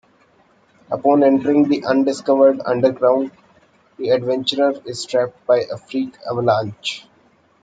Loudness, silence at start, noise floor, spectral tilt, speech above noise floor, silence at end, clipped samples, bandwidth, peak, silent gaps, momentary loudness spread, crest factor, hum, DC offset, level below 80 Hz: -18 LUFS; 0.9 s; -56 dBFS; -5.5 dB/octave; 39 dB; 0.6 s; under 0.1%; 9.2 kHz; -2 dBFS; none; 12 LU; 16 dB; none; under 0.1%; -64 dBFS